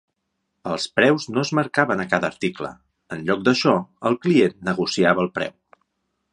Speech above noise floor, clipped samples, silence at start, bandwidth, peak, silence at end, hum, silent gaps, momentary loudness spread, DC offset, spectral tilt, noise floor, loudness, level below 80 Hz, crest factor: 55 dB; under 0.1%; 0.65 s; 11 kHz; -2 dBFS; 0.85 s; none; none; 11 LU; under 0.1%; -5.5 dB/octave; -76 dBFS; -21 LUFS; -60 dBFS; 20 dB